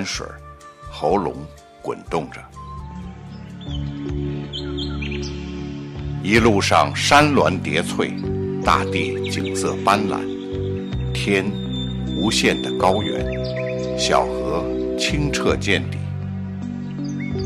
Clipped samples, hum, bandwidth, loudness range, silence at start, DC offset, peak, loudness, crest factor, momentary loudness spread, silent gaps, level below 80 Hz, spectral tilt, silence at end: under 0.1%; none; 15.5 kHz; 11 LU; 0 s; under 0.1%; -2 dBFS; -21 LUFS; 20 dB; 18 LU; none; -36 dBFS; -5 dB/octave; 0 s